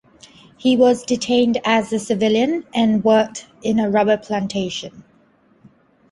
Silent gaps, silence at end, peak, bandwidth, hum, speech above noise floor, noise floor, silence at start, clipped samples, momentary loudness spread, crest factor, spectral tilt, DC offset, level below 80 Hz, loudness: none; 1.1 s; -2 dBFS; 11.5 kHz; none; 38 dB; -56 dBFS; 0.65 s; under 0.1%; 10 LU; 16 dB; -5 dB/octave; under 0.1%; -56 dBFS; -18 LUFS